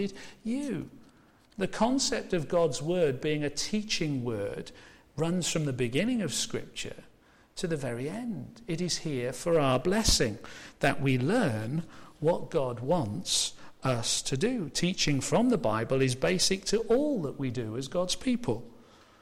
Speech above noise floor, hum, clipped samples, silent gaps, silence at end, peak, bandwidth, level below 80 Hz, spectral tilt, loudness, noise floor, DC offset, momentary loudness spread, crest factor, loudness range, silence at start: 30 dB; none; under 0.1%; none; 0.4 s; -12 dBFS; 16.5 kHz; -48 dBFS; -4.5 dB/octave; -29 LUFS; -60 dBFS; under 0.1%; 11 LU; 18 dB; 5 LU; 0 s